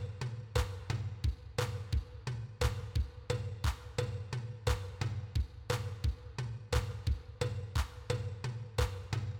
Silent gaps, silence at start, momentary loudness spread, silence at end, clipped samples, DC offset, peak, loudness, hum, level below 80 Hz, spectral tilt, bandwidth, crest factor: none; 0 s; 5 LU; 0 s; under 0.1%; under 0.1%; -18 dBFS; -38 LUFS; none; -42 dBFS; -5.5 dB/octave; 18.5 kHz; 18 dB